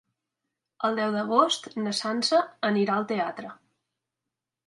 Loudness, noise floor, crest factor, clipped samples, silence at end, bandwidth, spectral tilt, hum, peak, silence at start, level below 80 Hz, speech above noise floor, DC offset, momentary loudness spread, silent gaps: -26 LUFS; -87 dBFS; 22 dB; under 0.1%; 1.15 s; 11.5 kHz; -4 dB/octave; none; -6 dBFS; 0.8 s; -80 dBFS; 61 dB; under 0.1%; 8 LU; none